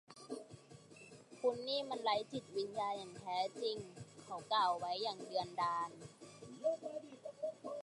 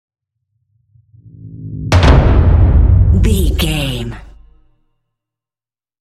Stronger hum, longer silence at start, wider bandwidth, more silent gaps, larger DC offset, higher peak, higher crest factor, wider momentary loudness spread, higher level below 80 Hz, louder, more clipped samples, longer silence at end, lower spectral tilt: neither; second, 0.1 s vs 1.45 s; second, 11.5 kHz vs 14 kHz; neither; neither; second, -24 dBFS vs 0 dBFS; about the same, 18 dB vs 14 dB; about the same, 19 LU vs 18 LU; second, -82 dBFS vs -16 dBFS; second, -41 LUFS vs -12 LUFS; neither; second, 0 s vs 1.9 s; second, -4 dB/octave vs -6.5 dB/octave